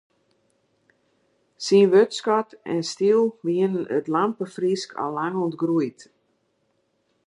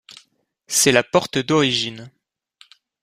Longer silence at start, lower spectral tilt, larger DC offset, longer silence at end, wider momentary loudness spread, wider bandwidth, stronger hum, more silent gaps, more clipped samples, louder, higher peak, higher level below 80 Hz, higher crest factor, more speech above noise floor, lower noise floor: first, 1.6 s vs 0.7 s; first, -5.5 dB/octave vs -3 dB/octave; neither; first, 1.35 s vs 0.95 s; about the same, 10 LU vs 10 LU; second, 11 kHz vs 15.5 kHz; neither; neither; neither; second, -22 LUFS vs -18 LUFS; second, -6 dBFS vs -2 dBFS; second, -76 dBFS vs -58 dBFS; about the same, 18 dB vs 20 dB; first, 48 dB vs 42 dB; first, -70 dBFS vs -61 dBFS